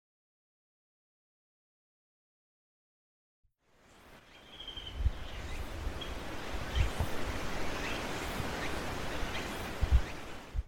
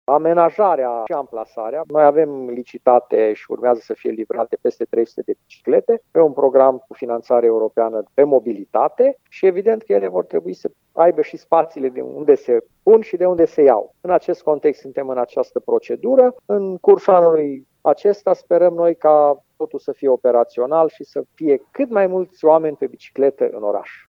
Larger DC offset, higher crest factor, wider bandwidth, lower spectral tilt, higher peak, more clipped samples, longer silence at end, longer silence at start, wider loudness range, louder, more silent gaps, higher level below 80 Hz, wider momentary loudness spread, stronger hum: neither; first, 22 dB vs 16 dB; first, 16.5 kHz vs 6.2 kHz; second, -4.5 dB/octave vs -8.5 dB/octave; second, -14 dBFS vs 0 dBFS; neither; second, 0 s vs 0.2 s; first, 3.9 s vs 0.1 s; first, 9 LU vs 3 LU; second, -38 LUFS vs -17 LUFS; neither; first, -40 dBFS vs -70 dBFS; about the same, 12 LU vs 12 LU; neither